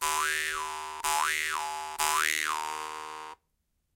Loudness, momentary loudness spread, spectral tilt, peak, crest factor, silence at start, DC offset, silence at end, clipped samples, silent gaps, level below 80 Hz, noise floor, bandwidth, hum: -30 LUFS; 13 LU; 1.5 dB/octave; -8 dBFS; 24 dB; 0 s; under 0.1%; 0.6 s; under 0.1%; none; -62 dBFS; -77 dBFS; 17 kHz; none